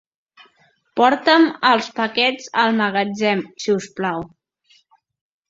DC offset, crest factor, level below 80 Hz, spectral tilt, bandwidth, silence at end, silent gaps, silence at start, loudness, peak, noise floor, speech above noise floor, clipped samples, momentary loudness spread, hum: under 0.1%; 18 dB; -64 dBFS; -4.5 dB/octave; 7.8 kHz; 1.25 s; none; 0.95 s; -18 LUFS; -2 dBFS; -59 dBFS; 41 dB; under 0.1%; 10 LU; none